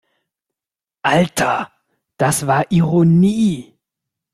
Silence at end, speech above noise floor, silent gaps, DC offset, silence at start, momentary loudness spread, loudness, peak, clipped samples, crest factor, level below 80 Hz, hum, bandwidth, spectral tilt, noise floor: 0.7 s; 75 dB; none; under 0.1%; 1.05 s; 10 LU; -16 LUFS; -2 dBFS; under 0.1%; 16 dB; -52 dBFS; none; 14 kHz; -6 dB/octave; -89 dBFS